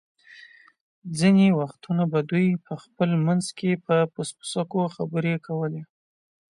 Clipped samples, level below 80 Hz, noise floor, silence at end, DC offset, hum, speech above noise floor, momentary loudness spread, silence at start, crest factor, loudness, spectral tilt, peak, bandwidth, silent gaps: under 0.1%; -68 dBFS; -50 dBFS; 0.65 s; under 0.1%; none; 27 dB; 12 LU; 0.3 s; 16 dB; -24 LUFS; -6.5 dB/octave; -8 dBFS; 11.5 kHz; 0.80-1.02 s